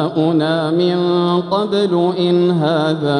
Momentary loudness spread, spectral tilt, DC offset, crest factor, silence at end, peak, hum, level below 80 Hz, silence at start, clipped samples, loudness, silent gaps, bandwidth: 2 LU; -7.5 dB/octave; under 0.1%; 12 dB; 0 s; -2 dBFS; none; -62 dBFS; 0 s; under 0.1%; -16 LUFS; none; 10.5 kHz